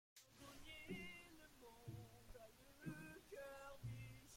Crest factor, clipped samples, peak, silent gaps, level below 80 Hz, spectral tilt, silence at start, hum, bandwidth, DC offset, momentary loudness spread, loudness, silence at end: 18 dB; under 0.1%; -40 dBFS; none; -70 dBFS; -5 dB/octave; 0.15 s; none; 16.5 kHz; under 0.1%; 10 LU; -58 LUFS; 0 s